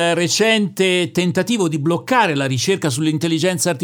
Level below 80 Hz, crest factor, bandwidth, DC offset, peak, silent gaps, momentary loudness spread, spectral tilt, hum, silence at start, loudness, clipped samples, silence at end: -62 dBFS; 16 dB; 19 kHz; under 0.1%; -2 dBFS; none; 3 LU; -4 dB/octave; none; 0 s; -17 LUFS; under 0.1%; 0 s